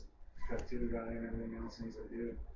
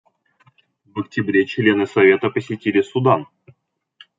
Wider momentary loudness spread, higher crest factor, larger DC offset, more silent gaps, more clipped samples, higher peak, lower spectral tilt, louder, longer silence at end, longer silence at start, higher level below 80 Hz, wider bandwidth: second, 7 LU vs 10 LU; about the same, 14 dB vs 18 dB; neither; neither; neither; second, -26 dBFS vs -2 dBFS; about the same, -7.5 dB/octave vs -7.5 dB/octave; second, -43 LUFS vs -18 LUFS; second, 0 s vs 0.95 s; second, 0 s vs 0.95 s; first, -48 dBFS vs -66 dBFS; about the same, 7.6 kHz vs 7.6 kHz